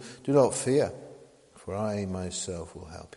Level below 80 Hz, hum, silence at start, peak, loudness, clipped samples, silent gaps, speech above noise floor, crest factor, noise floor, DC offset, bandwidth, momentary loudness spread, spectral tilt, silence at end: -58 dBFS; none; 0 s; -10 dBFS; -28 LUFS; under 0.1%; none; 26 dB; 20 dB; -54 dBFS; under 0.1%; 11.5 kHz; 21 LU; -5.5 dB/octave; 0.1 s